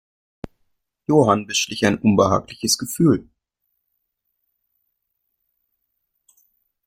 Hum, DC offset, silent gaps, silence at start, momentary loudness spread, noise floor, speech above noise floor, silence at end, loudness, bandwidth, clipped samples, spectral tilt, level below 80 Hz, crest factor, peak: none; under 0.1%; none; 1.1 s; 24 LU; -76 dBFS; 57 dB; 3.65 s; -19 LUFS; 16 kHz; under 0.1%; -4.5 dB/octave; -54 dBFS; 22 dB; -2 dBFS